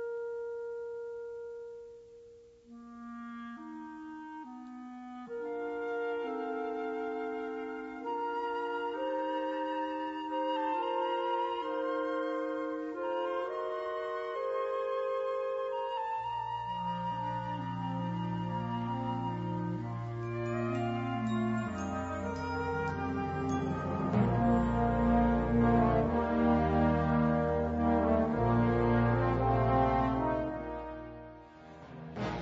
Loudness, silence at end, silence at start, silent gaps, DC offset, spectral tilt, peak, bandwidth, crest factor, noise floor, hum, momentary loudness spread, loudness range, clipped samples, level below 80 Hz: -33 LUFS; 0 s; 0 s; none; under 0.1%; -8.5 dB/octave; -16 dBFS; 7.8 kHz; 18 dB; -56 dBFS; 60 Hz at -55 dBFS; 17 LU; 13 LU; under 0.1%; -48 dBFS